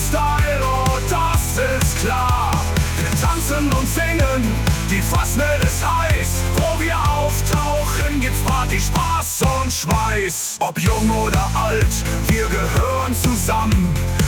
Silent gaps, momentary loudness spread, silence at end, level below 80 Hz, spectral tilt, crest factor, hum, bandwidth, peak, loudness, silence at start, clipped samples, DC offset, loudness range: none; 2 LU; 0 s; -24 dBFS; -4.5 dB/octave; 12 dB; none; 19.5 kHz; -6 dBFS; -18 LUFS; 0 s; under 0.1%; under 0.1%; 1 LU